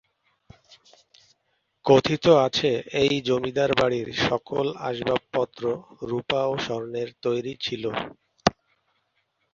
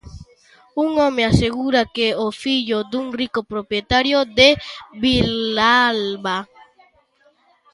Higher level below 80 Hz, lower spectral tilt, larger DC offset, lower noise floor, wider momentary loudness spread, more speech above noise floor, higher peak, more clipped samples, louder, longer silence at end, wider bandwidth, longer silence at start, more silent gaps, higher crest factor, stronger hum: second, -56 dBFS vs -40 dBFS; about the same, -5 dB/octave vs -5 dB/octave; neither; first, -73 dBFS vs -58 dBFS; about the same, 11 LU vs 11 LU; first, 49 dB vs 40 dB; about the same, -2 dBFS vs 0 dBFS; neither; second, -24 LUFS vs -18 LUFS; second, 1 s vs 1.3 s; second, 7.4 kHz vs 11.5 kHz; first, 1.85 s vs 0.05 s; neither; about the same, 24 dB vs 20 dB; neither